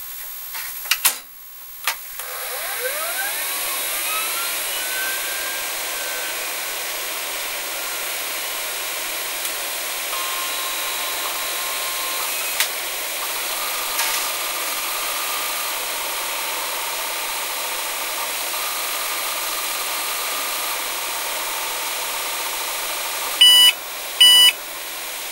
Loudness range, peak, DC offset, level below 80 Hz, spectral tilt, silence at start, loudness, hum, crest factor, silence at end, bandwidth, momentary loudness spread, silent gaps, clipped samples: 7 LU; 0 dBFS; under 0.1%; -60 dBFS; 2.5 dB/octave; 0 s; -20 LUFS; none; 22 dB; 0 s; 16 kHz; 7 LU; none; under 0.1%